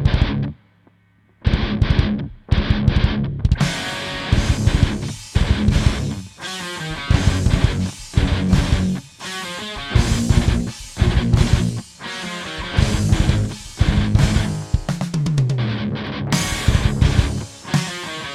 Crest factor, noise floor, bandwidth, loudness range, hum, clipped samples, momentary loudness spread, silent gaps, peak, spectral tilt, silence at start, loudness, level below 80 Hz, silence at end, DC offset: 18 dB; -56 dBFS; 14 kHz; 1 LU; none; under 0.1%; 10 LU; none; -2 dBFS; -5.5 dB/octave; 0 s; -20 LUFS; -24 dBFS; 0 s; under 0.1%